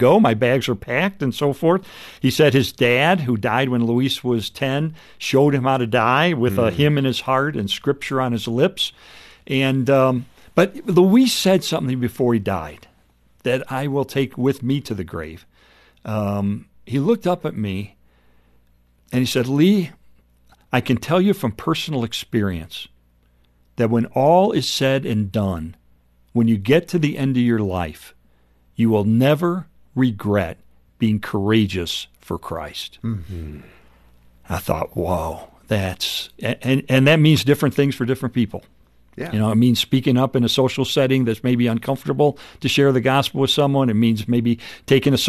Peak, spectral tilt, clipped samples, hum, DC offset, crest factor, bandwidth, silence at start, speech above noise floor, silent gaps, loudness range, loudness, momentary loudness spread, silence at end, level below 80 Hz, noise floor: -2 dBFS; -6 dB/octave; under 0.1%; 60 Hz at -45 dBFS; under 0.1%; 16 dB; 13.5 kHz; 0 s; 39 dB; none; 6 LU; -19 LUFS; 12 LU; 0 s; -48 dBFS; -57 dBFS